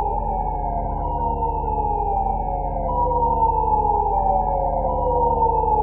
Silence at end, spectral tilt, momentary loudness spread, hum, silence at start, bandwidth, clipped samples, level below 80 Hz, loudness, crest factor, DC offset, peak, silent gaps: 0 s; -14 dB/octave; 6 LU; none; 0 s; 3 kHz; under 0.1%; -28 dBFS; -21 LUFS; 12 dB; under 0.1%; -8 dBFS; none